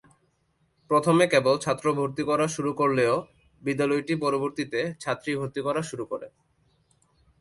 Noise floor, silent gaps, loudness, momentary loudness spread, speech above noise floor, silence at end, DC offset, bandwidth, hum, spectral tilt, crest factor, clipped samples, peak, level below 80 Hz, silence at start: -70 dBFS; none; -26 LUFS; 11 LU; 44 dB; 1.15 s; under 0.1%; 11.5 kHz; none; -5.5 dB/octave; 20 dB; under 0.1%; -6 dBFS; -64 dBFS; 0.9 s